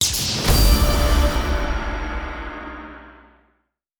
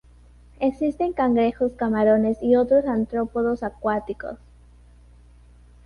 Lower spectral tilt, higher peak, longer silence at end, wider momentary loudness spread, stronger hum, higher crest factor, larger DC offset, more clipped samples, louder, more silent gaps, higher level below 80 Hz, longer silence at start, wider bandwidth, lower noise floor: second, -3.5 dB/octave vs -8.5 dB/octave; first, -2 dBFS vs -8 dBFS; second, 0.9 s vs 1.5 s; first, 18 LU vs 9 LU; second, none vs 60 Hz at -40 dBFS; about the same, 18 dB vs 16 dB; neither; neither; about the same, -20 LUFS vs -22 LUFS; neither; first, -22 dBFS vs -48 dBFS; second, 0 s vs 0.6 s; first, over 20 kHz vs 6.4 kHz; first, -69 dBFS vs -50 dBFS